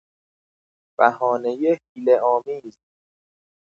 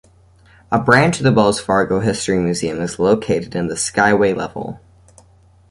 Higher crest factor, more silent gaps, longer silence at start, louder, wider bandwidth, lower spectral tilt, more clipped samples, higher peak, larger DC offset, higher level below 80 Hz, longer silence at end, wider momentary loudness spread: first, 22 dB vs 16 dB; first, 1.89-1.95 s vs none; first, 1 s vs 0.7 s; second, -20 LUFS vs -16 LUFS; second, 7 kHz vs 11.5 kHz; first, -7 dB/octave vs -5 dB/octave; neither; about the same, 0 dBFS vs -2 dBFS; neither; second, -80 dBFS vs -46 dBFS; about the same, 1.05 s vs 0.95 s; first, 14 LU vs 10 LU